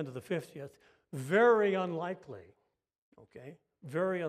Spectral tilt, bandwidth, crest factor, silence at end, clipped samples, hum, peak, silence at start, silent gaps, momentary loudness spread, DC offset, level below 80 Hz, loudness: -6.5 dB/octave; 14.5 kHz; 20 dB; 0 s; under 0.1%; none; -14 dBFS; 0 s; 2.98-3.12 s; 26 LU; under 0.1%; -82 dBFS; -31 LUFS